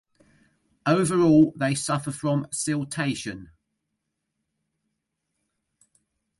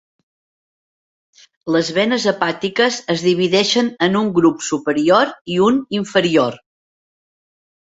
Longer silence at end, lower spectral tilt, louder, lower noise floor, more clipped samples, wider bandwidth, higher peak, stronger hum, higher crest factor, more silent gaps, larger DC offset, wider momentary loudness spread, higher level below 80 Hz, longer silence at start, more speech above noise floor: first, 2.95 s vs 1.25 s; about the same, -5.5 dB/octave vs -4.5 dB/octave; second, -23 LUFS vs -16 LUFS; second, -80 dBFS vs under -90 dBFS; neither; first, 11.5 kHz vs 8 kHz; second, -8 dBFS vs -2 dBFS; neither; about the same, 20 dB vs 16 dB; second, none vs 5.41-5.45 s; neither; first, 13 LU vs 5 LU; about the same, -62 dBFS vs -58 dBFS; second, 0.85 s vs 1.65 s; second, 57 dB vs over 74 dB